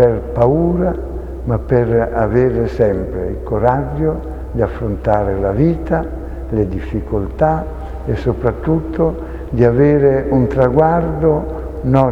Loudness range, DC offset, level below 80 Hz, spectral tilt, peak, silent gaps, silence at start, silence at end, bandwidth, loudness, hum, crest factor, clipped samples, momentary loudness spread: 4 LU; under 0.1%; -26 dBFS; -10.5 dB/octave; 0 dBFS; none; 0 s; 0 s; 7.2 kHz; -16 LUFS; none; 16 dB; under 0.1%; 10 LU